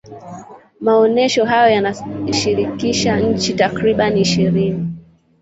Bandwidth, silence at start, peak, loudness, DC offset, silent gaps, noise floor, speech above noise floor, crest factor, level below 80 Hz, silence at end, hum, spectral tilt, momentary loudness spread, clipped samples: 8 kHz; 0.05 s; -2 dBFS; -16 LUFS; under 0.1%; none; -37 dBFS; 21 dB; 14 dB; -46 dBFS; 0.4 s; none; -5 dB/octave; 15 LU; under 0.1%